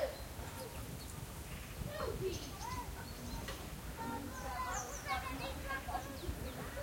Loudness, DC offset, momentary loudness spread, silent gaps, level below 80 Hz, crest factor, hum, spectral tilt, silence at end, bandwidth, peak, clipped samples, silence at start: -44 LUFS; under 0.1%; 6 LU; none; -50 dBFS; 18 dB; none; -4 dB/octave; 0 s; 16.5 kHz; -26 dBFS; under 0.1%; 0 s